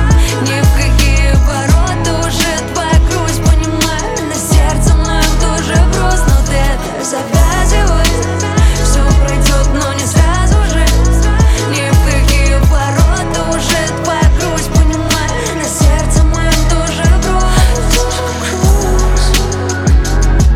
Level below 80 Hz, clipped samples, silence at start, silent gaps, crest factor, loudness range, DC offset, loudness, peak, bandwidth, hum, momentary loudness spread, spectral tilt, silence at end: -12 dBFS; under 0.1%; 0 s; none; 10 dB; 1 LU; under 0.1%; -12 LUFS; 0 dBFS; 16.5 kHz; none; 4 LU; -4.5 dB/octave; 0 s